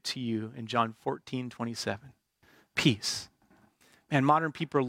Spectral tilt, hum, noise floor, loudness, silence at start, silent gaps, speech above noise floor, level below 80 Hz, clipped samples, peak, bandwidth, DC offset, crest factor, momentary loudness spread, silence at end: -4.5 dB/octave; none; -65 dBFS; -31 LUFS; 0.05 s; none; 35 dB; -70 dBFS; under 0.1%; -10 dBFS; 16.5 kHz; under 0.1%; 22 dB; 11 LU; 0 s